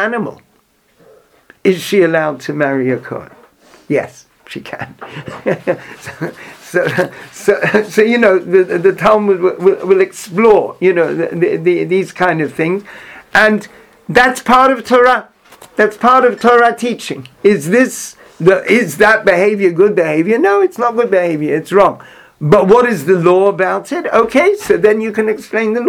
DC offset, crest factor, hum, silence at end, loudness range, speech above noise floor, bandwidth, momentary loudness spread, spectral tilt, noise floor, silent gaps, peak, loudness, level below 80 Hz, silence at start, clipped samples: under 0.1%; 12 dB; none; 0 s; 8 LU; 43 dB; 16.5 kHz; 15 LU; -5.5 dB/octave; -55 dBFS; none; 0 dBFS; -12 LUFS; -50 dBFS; 0 s; 0.2%